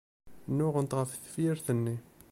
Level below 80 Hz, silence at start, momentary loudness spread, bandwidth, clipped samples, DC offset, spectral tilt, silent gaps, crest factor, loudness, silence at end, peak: -66 dBFS; 0.25 s; 8 LU; 16.5 kHz; under 0.1%; under 0.1%; -7 dB/octave; none; 16 dB; -32 LUFS; 0.3 s; -18 dBFS